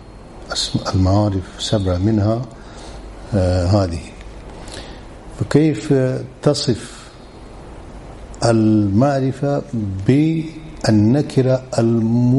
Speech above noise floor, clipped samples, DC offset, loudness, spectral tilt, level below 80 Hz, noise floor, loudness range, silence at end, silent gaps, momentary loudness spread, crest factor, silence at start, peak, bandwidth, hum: 21 dB; under 0.1%; under 0.1%; -18 LUFS; -6.5 dB/octave; -38 dBFS; -38 dBFS; 4 LU; 0 s; none; 22 LU; 18 dB; 0 s; 0 dBFS; 11.5 kHz; none